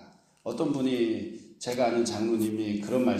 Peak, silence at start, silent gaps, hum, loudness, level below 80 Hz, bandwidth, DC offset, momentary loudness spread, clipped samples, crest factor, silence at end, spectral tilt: -14 dBFS; 0 s; none; none; -29 LUFS; -68 dBFS; 15.5 kHz; under 0.1%; 11 LU; under 0.1%; 14 dB; 0 s; -5.5 dB/octave